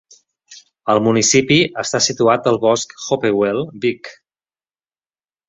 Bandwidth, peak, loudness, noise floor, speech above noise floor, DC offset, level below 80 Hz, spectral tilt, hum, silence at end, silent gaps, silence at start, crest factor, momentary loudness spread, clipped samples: 8.4 kHz; -2 dBFS; -16 LUFS; under -90 dBFS; over 74 dB; under 0.1%; -56 dBFS; -3.5 dB/octave; none; 1.35 s; none; 0.5 s; 18 dB; 9 LU; under 0.1%